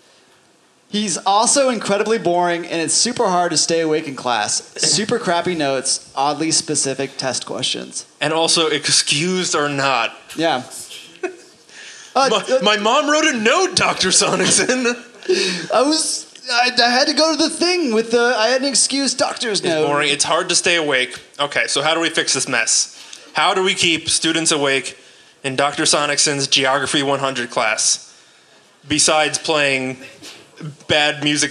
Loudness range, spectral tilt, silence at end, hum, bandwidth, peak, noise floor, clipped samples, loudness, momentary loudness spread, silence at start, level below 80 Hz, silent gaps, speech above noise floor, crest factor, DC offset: 3 LU; -2 dB/octave; 0 s; none; 13 kHz; 0 dBFS; -54 dBFS; under 0.1%; -16 LUFS; 10 LU; 0.9 s; -62 dBFS; none; 37 dB; 18 dB; under 0.1%